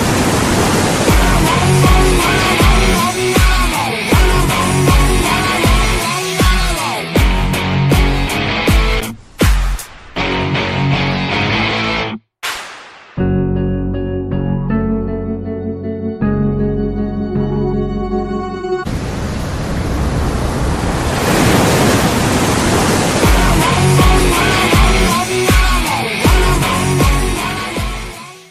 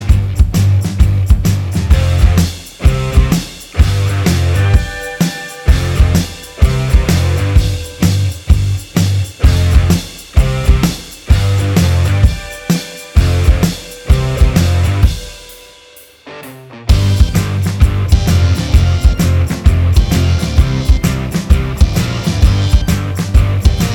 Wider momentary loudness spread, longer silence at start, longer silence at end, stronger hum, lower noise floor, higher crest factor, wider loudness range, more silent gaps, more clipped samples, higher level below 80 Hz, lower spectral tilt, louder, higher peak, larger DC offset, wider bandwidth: first, 10 LU vs 6 LU; about the same, 0 s vs 0 s; about the same, 0.1 s vs 0 s; neither; second, -35 dBFS vs -40 dBFS; about the same, 14 dB vs 12 dB; first, 7 LU vs 3 LU; neither; second, under 0.1% vs 0.4%; second, -20 dBFS vs -14 dBFS; second, -4.5 dB/octave vs -6 dB/octave; about the same, -14 LUFS vs -13 LUFS; about the same, 0 dBFS vs 0 dBFS; neither; second, 15.5 kHz vs 17.5 kHz